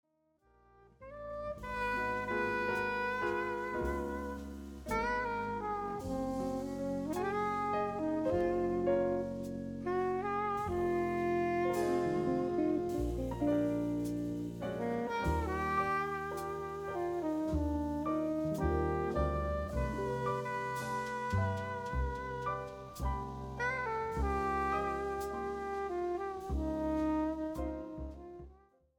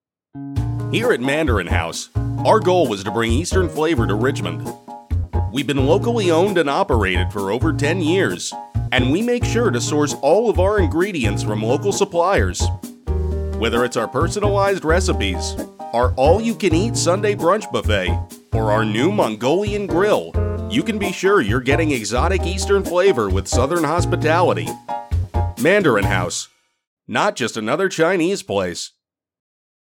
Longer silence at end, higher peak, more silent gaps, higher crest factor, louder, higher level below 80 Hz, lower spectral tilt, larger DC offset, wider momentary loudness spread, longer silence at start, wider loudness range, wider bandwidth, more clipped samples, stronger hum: second, 0.4 s vs 0.95 s; second, -20 dBFS vs -2 dBFS; second, none vs 26.87-26.97 s; about the same, 14 dB vs 16 dB; second, -36 LUFS vs -19 LUFS; second, -48 dBFS vs -30 dBFS; first, -7 dB/octave vs -5.5 dB/octave; neither; about the same, 8 LU vs 8 LU; first, 1 s vs 0.35 s; about the same, 4 LU vs 2 LU; first, 19 kHz vs 17 kHz; neither; neither